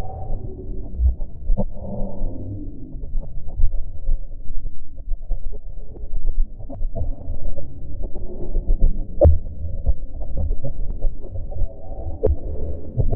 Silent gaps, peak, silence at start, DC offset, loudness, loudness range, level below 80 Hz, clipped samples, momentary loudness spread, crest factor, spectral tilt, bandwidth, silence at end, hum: none; -4 dBFS; 0 s; under 0.1%; -28 LUFS; 9 LU; -22 dBFS; under 0.1%; 12 LU; 14 dB; -14 dB/octave; 1.1 kHz; 0 s; none